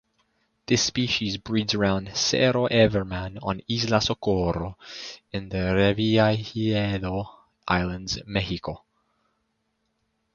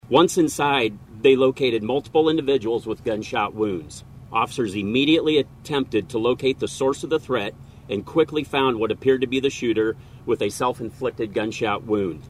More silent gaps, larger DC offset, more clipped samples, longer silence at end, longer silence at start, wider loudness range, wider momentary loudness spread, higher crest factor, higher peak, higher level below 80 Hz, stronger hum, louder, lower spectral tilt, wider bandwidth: neither; neither; neither; first, 1.6 s vs 0 s; first, 0.7 s vs 0.05 s; about the same, 5 LU vs 3 LU; first, 14 LU vs 9 LU; about the same, 22 dB vs 18 dB; about the same, -4 dBFS vs -4 dBFS; first, -46 dBFS vs -52 dBFS; neither; about the same, -24 LUFS vs -22 LUFS; about the same, -4.5 dB/octave vs -5 dB/octave; second, 7.2 kHz vs 14.5 kHz